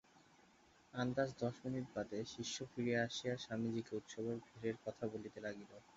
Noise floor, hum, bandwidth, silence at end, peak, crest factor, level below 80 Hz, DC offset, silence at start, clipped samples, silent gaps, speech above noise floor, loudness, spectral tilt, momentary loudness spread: -69 dBFS; none; 7.6 kHz; 0.05 s; -24 dBFS; 20 dB; -74 dBFS; under 0.1%; 0.15 s; under 0.1%; none; 26 dB; -44 LUFS; -5 dB/octave; 8 LU